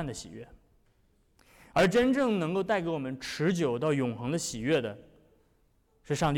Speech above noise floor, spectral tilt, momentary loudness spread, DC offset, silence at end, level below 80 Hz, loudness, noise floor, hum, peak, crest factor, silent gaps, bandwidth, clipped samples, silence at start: 39 dB; -5.5 dB/octave; 15 LU; under 0.1%; 0 s; -56 dBFS; -29 LUFS; -68 dBFS; none; -18 dBFS; 12 dB; none; 17.5 kHz; under 0.1%; 0 s